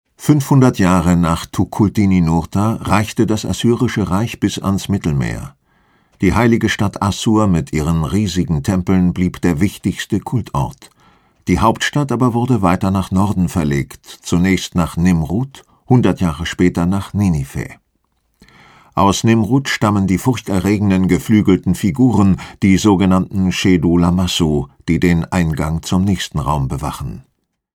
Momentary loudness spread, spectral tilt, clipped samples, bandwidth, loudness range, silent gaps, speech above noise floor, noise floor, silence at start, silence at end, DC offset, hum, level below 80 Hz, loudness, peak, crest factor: 8 LU; -6 dB/octave; under 0.1%; 17 kHz; 4 LU; none; 50 dB; -64 dBFS; 0.2 s; 0.6 s; under 0.1%; none; -34 dBFS; -16 LUFS; 0 dBFS; 16 dB